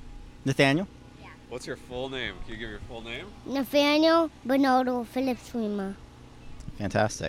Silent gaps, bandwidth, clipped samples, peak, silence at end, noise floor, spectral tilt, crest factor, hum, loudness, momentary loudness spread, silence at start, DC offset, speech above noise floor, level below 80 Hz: none; 16 kHz; under 0.1%; -10 dBFS; 0 s; -48 dBFS; -5 dB/octave; 18 dB; none; -27 LUFS; 18 LU; 0 s; under 0.1%; 21 dB; -50 dBFS